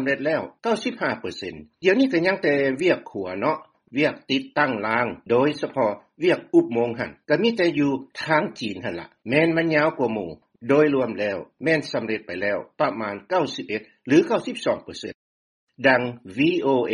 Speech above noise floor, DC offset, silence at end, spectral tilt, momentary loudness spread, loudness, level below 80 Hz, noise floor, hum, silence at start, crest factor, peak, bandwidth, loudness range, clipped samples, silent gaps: over 67 dB; under 0.1%; 0 s; -6 dB/octave; 12 LU; -23 LUFS; -64 dBFS; under -90 dBFS; none; 0 s; 20 dB; -2 dBFS; 11 kHz; 2 LU; under 0.1%; 15.15-15.67 s